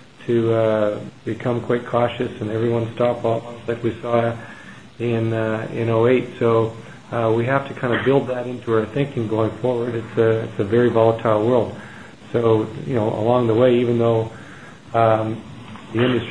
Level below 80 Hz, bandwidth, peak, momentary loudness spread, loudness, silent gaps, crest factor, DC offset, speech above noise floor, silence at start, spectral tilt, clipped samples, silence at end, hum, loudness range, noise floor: -56 dBFS; 10 kHz; -2 dBFS; 12 LU; -20 LUFS; none; 18 dB; 0.4%; 21 dB; 0.2 s; -8 dB/octave; under 0.1%; 0 s; none; 4 LU; -40 dBFS